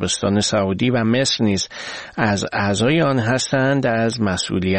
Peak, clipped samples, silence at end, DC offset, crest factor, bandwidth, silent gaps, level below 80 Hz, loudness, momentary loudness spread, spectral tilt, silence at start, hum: -2 dBFS; under 0.1%; 0 s; 0.2%; 16 dB; 8.8 kHz; none; -48 dBFS; -19 LUFS; 5 LU; -4.5 dB/octave; 0 s; none